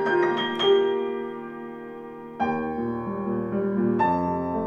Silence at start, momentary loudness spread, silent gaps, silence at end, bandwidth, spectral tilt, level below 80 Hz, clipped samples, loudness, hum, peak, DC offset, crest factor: 0 s; 16 LU; none; 0 s; 7 kHz; -7 dB/octave; -56 dBFS; under 0.1%; -25 LUFS; none; -10 dBFS; under 0.1%; 14 dB